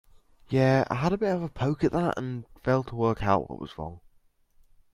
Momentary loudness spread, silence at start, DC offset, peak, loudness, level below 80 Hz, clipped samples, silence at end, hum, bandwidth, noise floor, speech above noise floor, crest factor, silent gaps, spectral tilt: 14 LU; 0.5 s; under 0.1%; -8 dBFS; -27 LUFS; -50 dBFS; under 0.1%; 0.95 s; none; 10.5 kHz; -63 dBFS; 37 dB; 20 dB; none; -8 dB/octave